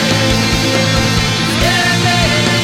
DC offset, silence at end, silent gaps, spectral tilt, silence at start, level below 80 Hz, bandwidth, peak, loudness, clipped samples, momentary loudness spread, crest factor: under 0.1%; 0 s; none; -4 dB/octave; 0 s; -26 dBFS; 17 kHz; 0 dBFS; -12 LUFS; under 0.1%; 2 LU; 12 dB